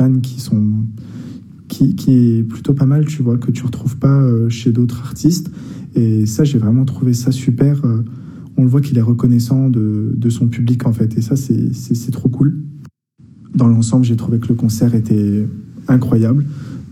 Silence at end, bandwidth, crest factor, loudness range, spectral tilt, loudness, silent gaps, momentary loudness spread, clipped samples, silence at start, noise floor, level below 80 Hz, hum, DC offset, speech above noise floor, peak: 0 s; 14.5 kHz; 12 dB; 2 LU; -8 dB/octave; -15 LUFS; none; 11 LU; under 0.1%; 0 s; -45 dBFS; -48 dBFS; none; under 0.1%; 31 dB; -2 dBFS